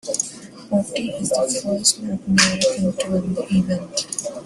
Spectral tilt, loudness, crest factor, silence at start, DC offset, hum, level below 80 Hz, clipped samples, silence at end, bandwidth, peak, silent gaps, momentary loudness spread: -3.5 dB/octave; -20 LUFS; 22 dB; 0.05 s; under 0.1%; none; -54 dBFS; under 0.1%; 0 s; 12.5 kHz; 0 dBFS; none; 9 LU